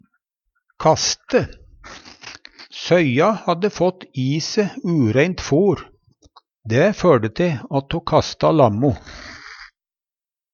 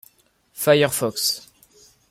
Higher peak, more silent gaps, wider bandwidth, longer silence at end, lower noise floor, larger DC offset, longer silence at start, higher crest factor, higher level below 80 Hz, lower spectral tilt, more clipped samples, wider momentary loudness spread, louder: first, 0 dBFS vs -4 dBFS; neither; second, 7.4 kHz vs 16.5 kHz; first, 0.85 s vs 0.7 s; first, under -90 dBFS vs -60 dBFS; neither; first, 0.8 s vs 0.55 s; about the same, 20 dB vs 20 dB; first, -46 dBFS vs -62 dBFS; first, -5.5 dB/octave vs -3 dB/octave; neither; first, 22 LU vs 12 LU; about the same, -18 LUFS vs -20 LUFS